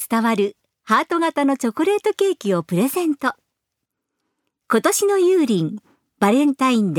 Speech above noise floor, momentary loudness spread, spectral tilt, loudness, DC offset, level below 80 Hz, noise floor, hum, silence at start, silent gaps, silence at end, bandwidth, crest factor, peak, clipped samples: 62 dB; 6 LU; -5 dB/octave; -19 LUFS; under 0.1%; -70 dBFS; -80 dBFS; none; 0 s; none; 0 s; 20 kHz; 18 dB; -2 dBFS; under 0.1%